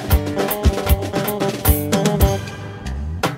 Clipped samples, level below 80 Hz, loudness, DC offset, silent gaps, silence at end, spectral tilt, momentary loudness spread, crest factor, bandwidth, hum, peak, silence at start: under 0.1%; -24 dBFS; -19 LUFS; under 0.1%; none; 0 s; -5.5 dB/octave; 11 LU; 16 dB; 16.5 kHz; none; -2 dBFS; 0 s